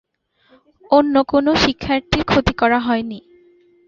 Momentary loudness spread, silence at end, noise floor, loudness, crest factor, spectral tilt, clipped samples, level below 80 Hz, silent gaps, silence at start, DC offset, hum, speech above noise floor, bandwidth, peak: 7 LU; 0.7 s; -58 dBFS; -17 LUFS; 16 dB; -5.5 dB/octave; under 0.1%; -38 dBFS; none; 0.9 s; under 0.1%; none; 42 dB; 7.6 kHz; -2 dBFS